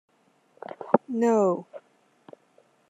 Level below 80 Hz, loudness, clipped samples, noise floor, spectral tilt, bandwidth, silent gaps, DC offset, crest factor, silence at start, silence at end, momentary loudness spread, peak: -78 dBFS; -25 LUFS; under 0.1%; -64 dBFS; -7.5 dB/octave; 8 kHz; none; under 0.1%; 26 dB; 0.7 s; 1.1 s; 24 LU; -4 dBFS